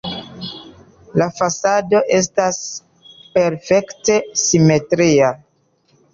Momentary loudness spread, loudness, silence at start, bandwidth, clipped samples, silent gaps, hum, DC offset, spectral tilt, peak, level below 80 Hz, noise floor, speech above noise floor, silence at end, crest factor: 17 LU; -16 LUFS; 0.05 s; 7.6 kHz; under 0.1%; none; none; under 0.1%; -4.5 dB/octave; -2 dBFS; -54 dBFS; -60 dBFS; 45 dB; 0.8 s; 14 dB